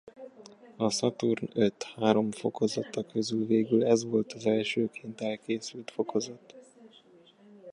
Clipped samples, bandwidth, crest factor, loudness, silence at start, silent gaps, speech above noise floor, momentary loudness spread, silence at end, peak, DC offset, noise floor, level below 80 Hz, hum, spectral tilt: under 0.1%; 11 kHz; 22 dB; -30 LUFS; 0.05 s; none; 29 dB; 10 LU; 0 s; -8 dBFS; under 0.1%; -58 dBFS; -72 dBFS; none; -5 dB/octave